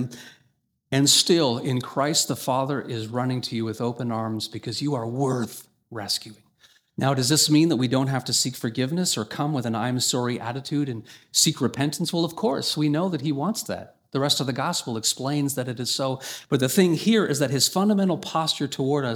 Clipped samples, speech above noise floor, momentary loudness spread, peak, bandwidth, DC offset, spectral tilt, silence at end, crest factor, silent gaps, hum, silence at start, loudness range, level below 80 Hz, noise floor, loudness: under 0.1%; 44 dB; 10 LU; -4 dBFS; 20 kHz; under 0.1%; -4 dB/octave; 0 s; 20 dB; none; none; 0 s; 5 LU; -68 dBFS; -68 dBFS; -23 LUFS